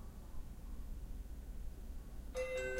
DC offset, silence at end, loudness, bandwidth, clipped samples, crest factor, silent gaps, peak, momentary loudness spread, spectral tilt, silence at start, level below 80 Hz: under 0.1%; 0 s; -49 LUFS; 16 kHz; under 0.1%; 16 dB; none; -30 dBFS; 11 LU; -5 dB/octave; 0 s; -48 dBFS